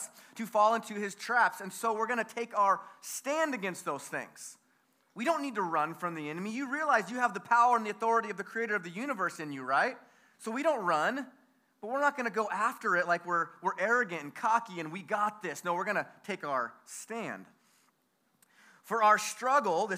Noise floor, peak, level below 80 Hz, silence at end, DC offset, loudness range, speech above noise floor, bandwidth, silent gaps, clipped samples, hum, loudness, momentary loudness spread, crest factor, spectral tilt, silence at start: -74 dBFS; -12 dBFS; under -90 dBFS; 0 s; under 0.1%; 5 LU; 43 dB; 15.5 kHz; none; under 0.1%; none; -31 LUFS; 12 LU; 20 dB; -3.5 dB/octave; 0 s